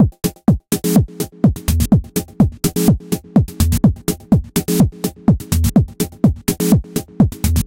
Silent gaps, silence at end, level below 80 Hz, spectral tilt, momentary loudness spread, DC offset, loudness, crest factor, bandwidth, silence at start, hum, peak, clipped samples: none; 0 s; -26 dBFS; -6.5 dB/octave; 4 LU; under 0.1%; -17 LUFS; 14 dB; 17 kHz; 0 s; none; -2 dBFS; under 0.1%